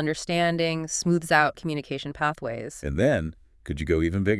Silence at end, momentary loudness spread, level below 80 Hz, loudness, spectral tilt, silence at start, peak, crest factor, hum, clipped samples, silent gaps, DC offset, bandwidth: 0 s; 12 LU; -44 dBFS; -25 LUFS; -5 dB/octave; 0 s; -6 dBFS; 20 dB; none; under 0.1%; none; under 0.1%; 12 kHz